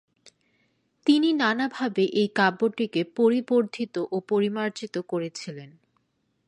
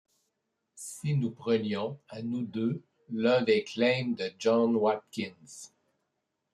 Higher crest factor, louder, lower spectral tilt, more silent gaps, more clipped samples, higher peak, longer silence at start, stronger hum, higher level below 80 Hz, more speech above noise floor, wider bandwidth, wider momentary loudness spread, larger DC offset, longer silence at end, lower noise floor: about the same, 18 dB vs 18 dB; first, -25 LUFS vs -30 LUFS; about the same, -5.5 dB/octave vs -6 dB/octave; neither; neither; first, -6 dBFS vs -12 dBFS; first, 1.05 s vs 0.75 s; neither; about the same, -78 dBFS vs -74 dBFS; second, 48 dB vs 53 dB; second, 10.5 kHz vs 13 kHz; second, 10 LU vs 15 LU; neither; about the same, 0.8 s vs 0.85 s; second, -73 dBFS vs -82 dBFS